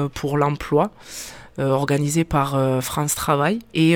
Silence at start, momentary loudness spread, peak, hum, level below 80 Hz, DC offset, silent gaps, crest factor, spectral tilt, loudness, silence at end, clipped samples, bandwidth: 0 s; 10 LU; -4 dBFS; none; -44 dBFS; under 0.1%; none; 16 dB; -5.5 dB/octave; -21 LUFS; 0 s; under 0.1%; 18.5 kHz